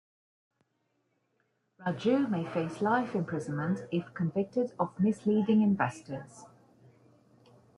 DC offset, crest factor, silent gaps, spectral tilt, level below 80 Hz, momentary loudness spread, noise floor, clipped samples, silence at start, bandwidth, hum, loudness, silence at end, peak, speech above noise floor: under 0.1%; 18 dB; none; -7.5 dB/octave; -74 dBFS; 11 LU; -77 dBFS; under 0.1%; 1.8 s; 11 kHz; none; -30 LUFS; 1.3 s; -14 dBFS; 47 dB